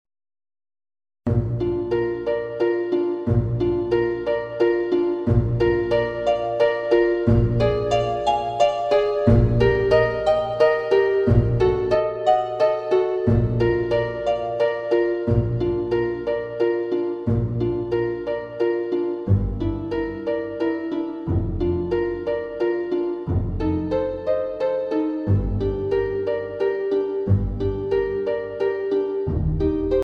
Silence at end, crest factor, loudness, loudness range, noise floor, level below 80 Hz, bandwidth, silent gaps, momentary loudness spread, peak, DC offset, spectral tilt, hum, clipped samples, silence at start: 0 s; 18 dB; -22 LUFS; 5 LU; under -90 dBFS; -34 dBFS; 8 kHz; none; 6 LU; -2 dBFS; under 0.1%; -8.5 dB/octave; none; under 0.1%; 1.25 s